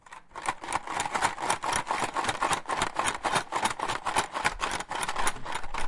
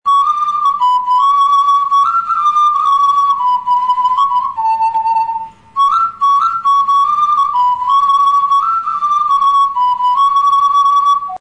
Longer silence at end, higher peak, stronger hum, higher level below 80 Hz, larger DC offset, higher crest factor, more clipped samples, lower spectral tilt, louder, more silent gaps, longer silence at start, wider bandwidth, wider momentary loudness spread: about the same, 0 s vs 0 s; about the same, -8 dBFS vs -6 dBFS; neither; first, -48 dBFS vs -58 dBFS; second, under 0.1% vs 0.3%; first, 22 dB vs 6 dB; neither; first, -2 dB/octave vs -0.5 dB/octave; second, -30 LUFS vs -12 LUFS; neither; about the same, 0.1 s vs 0.05 s; about the same, 11.5 kHz vs 10.5 kHz; about the same, 6 LU vs 4 LU